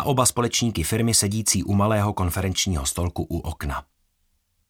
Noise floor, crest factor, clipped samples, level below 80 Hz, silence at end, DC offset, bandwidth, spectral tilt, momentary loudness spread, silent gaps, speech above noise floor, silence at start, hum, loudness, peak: -69 dBFS; 20 dB; under 0.1%; -38 dBFS; 0.9 s; under 0.1%; 18 kHz; -4 dB/octave; 10 LU; none; 46 dB; 0 s; none; -22 LUFS; -4 dBFS